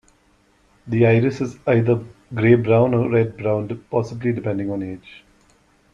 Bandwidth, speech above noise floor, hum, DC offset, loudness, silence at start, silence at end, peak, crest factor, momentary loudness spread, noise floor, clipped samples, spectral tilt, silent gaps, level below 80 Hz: 7.2 kHz; 40 dB; none; under 0.1%; -20 LUFS; 0.85 s; 0.75 s; -2 dBFS; 18 dB; 11 LU; -59 dBFS; under 0.1%; -9 dB/octave; none; -54 dBFS